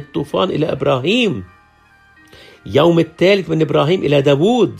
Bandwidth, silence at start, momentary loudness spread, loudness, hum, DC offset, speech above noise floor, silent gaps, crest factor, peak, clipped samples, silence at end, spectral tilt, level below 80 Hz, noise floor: 13.5 kHz; 0 s; 6 LU; -15 LUFS; none; under 0.1%; 36 dB; none; 14 dB; 0 dBFS; under 0.1%; 0 s; -6.5 dB/octave; -52 dBFS; -50 dBFS